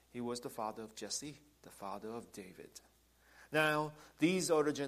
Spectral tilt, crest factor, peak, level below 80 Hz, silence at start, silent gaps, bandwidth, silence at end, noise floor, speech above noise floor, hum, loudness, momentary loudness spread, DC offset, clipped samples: -4 dB/octave; 20 dB; -18 dBFS; -74 dBFS; 0.15 s; none; 15 kHz; 0 s; -66 dBFS; 27 dB; none; -38 LUFS; 22 LU; under 0.1%; under 0.1%